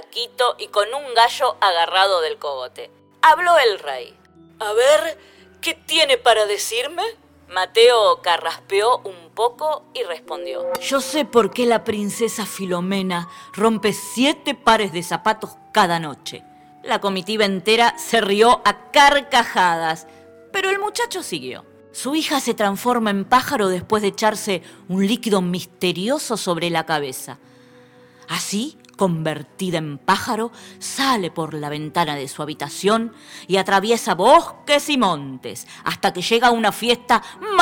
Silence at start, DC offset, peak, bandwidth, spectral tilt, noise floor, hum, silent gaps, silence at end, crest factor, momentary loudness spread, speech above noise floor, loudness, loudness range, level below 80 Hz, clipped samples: 0 s; under 0.1%; 0 dBFS; 17.5 kHz; -3.5 dB/octave; -48 dBFS; none; none; 0 s; 20 dB; 13 LU; 29 dB; -19 LUFS; 6 LU; -56 dBFS; under 0.1%